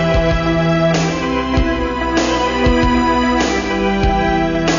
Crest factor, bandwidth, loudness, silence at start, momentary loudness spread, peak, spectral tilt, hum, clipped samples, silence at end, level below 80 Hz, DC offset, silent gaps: 12 dB; 7.4 kHz; -15 LUFS; 0 s; 3 LU; -2 dBFS; -5.5 dB/octave; none; under 0.1%; 0 s; -24 dBFS; under 0.1%; none